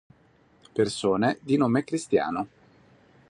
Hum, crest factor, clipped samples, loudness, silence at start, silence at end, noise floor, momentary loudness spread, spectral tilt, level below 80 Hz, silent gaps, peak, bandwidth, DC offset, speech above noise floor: none; 18 dB; under 0.1%; -26 LUFS; 0.75 s; 0.85 s; -60 dBFS; 10 LU; -6 dB/octave; -62 dBFS; none; -10 dBFS; 11.5 kHz; under 0.1%; 36 dB